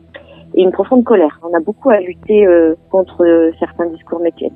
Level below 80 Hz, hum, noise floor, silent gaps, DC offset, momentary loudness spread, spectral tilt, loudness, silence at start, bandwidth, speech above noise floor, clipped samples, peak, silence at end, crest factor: -50 dBFS; none; -37 dBFS; none; under 0.1%; 9 LU; -10 dB/octave; -13 LUFS; 0.15 s; 3.8 kHz; 25 dB; under 0.1%; 0 dBFS; 0.05 s; 12 dB